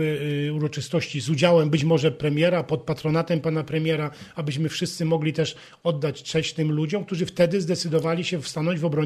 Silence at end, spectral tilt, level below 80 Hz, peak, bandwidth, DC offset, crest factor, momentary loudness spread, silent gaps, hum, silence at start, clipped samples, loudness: 0 s; -6 dB/octave; -60 dBFS; -6 dBFS; 13.5 kHz; under 0.1%; 18 dB; 7 LU; none; none; 0 s; under 0.1%; -24 LUFS